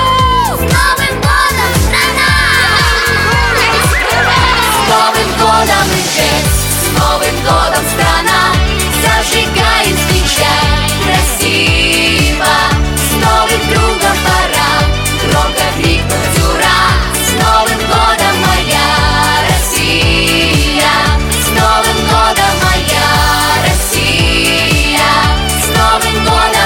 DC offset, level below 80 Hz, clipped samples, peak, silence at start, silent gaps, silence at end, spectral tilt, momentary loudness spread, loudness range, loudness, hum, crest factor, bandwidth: under 0.1%; -18 dBFS; under 0.1%; 0 dBFS; 0 s; none; 0 s; -3 dB/octave; 3 LU; 1 LU; -9 LUFS; none; 10 dB; 17.5 kHz